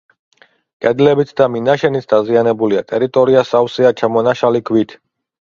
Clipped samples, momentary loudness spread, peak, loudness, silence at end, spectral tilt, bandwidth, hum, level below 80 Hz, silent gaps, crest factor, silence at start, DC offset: under 0.1%; 5 LU; 0 dBFS; -14 LUFS; 0.65 s; -7 dB/octave; 7.2 kHz; none; -56 dBFS; none; 14 dB; 0.8 s; under 0.1%